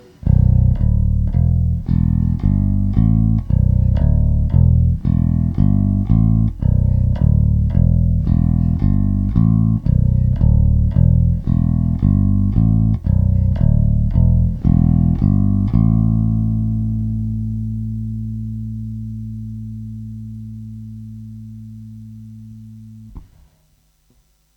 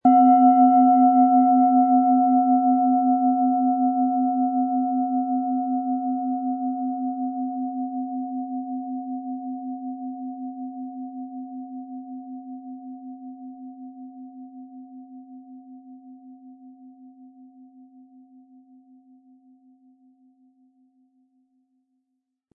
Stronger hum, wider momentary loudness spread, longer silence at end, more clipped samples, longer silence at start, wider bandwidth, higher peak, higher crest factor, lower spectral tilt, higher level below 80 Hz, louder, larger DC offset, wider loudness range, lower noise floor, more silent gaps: neither; second, 17 LU vs 25 LU; second, 1.35 s vs 5.3 s; neither; first, 0.25 s vs 0.05 s; about the same, 2.3 kHz vs 2.2 kHz; first, 0 dBFS vs -6 dBFS; about the same, 16 dB vs 18 dB; about the same, -12 dB/octave vs -11.5 dB/octave; first, -22 dBFS vs -82 dBFS; first, -16 LUFS vs -21 LUFS; neither; second, 15 LU vs 24 LU; second, -58 dBFS vs -78 dBFS; neither